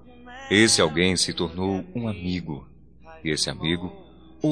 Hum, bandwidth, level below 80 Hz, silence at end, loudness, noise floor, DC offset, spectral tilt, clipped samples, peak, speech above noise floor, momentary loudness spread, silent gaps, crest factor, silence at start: none; 10.5 kHz; -50 dBFS; 0 s; -23 LUFS; -48 dBFS; 0.2%; -3.5 dB/octave; under 0.1%; -4 dBFS; 24 dB; 19 LU; none; 20 dB; 0.05 s